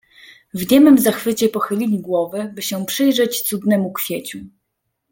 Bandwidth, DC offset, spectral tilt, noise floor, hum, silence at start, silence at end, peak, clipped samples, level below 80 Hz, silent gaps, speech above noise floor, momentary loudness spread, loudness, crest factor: 17 kHz; under 0.1%; -4.5 dB/octave; -74 dBFS; none; 0.55 s; 0.65 s; -2 dBFS; under 0.1%; -58 dBFS; none; 58 dB; 15 LU; -17 LUFS; 16 dB